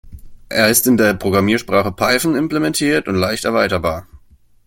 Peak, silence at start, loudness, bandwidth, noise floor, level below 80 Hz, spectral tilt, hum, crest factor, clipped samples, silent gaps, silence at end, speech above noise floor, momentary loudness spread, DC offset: 0 dBFS; 0.05 s; -16 LUFS; 17 kHz; -48 dBFS; -44 dBFS; -4 dB/octave; none; 16 dB; under 0.1%; none; 0.5 s; 33 dB; 7 LU; under 0.1%